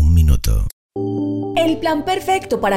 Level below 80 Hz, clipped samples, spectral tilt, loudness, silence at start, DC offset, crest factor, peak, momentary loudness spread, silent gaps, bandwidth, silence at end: -22 dBFS; under 0.1%; -6.5 dB/octave; -19 LUFS; 0 s; under 0.1%; 16 dB; 0 dBFS; 8 LU; 0.73-0.89 s; 16 kHz; 0 s